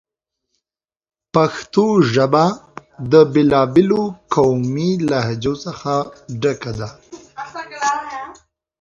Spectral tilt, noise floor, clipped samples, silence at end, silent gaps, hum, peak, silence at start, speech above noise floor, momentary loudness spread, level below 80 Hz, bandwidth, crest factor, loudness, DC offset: -6.5 dB/octave; under -90 dBFS; under 0.1%; 0.5 s; none; none; 0 dBFS; 1.35 s; over 74 dB; 18 LU; -52 dBFS; 7.8 kHz; 18 dB; -17 LUFS; under 0.1%